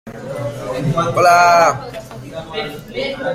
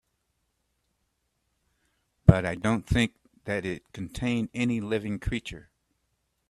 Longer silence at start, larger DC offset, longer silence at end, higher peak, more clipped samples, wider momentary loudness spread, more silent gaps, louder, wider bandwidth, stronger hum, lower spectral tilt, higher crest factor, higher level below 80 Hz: second, 0.05 s vs 2.25 s; neither; second, 0 s vs 0.9 s; about the same, 0 dBFS vs 0 dBFS; neither; first, 21 LU vs 17 LU; neither; first, -15 LUFS vs -27 LUFS; first, 16 kHz vs 12.5 kHz; neither; second, -4.5 dB/octave vs -7 dB/octave; second, 16 dB vs 28 dB; about the same, -46 dBFS vs -44 dBFS